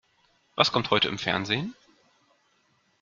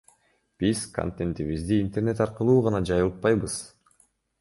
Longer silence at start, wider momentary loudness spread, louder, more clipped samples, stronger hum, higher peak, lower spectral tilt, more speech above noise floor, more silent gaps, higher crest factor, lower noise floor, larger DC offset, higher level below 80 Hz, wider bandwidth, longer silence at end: about the same, 0.55 s vs 0.6 s; first, 12 LU vs 9 LU; about the same, -25 LUFS vs -26 LUFS; neither; neither; first, -4 dBFS vs -8 dBFS; second, -4 dB/octave vs -6.5 dB/octave; about the same, 42 dB vs 42 dB; neither; first, 26 dB vs 18 dB; about the same, -68 dBFS vs -66 dBFS; neither; second, -64 dBFS vs -46 dBFS; second, 7.6 kHz vs 11.5 kHz; first, 1.3 s vs 0.75 s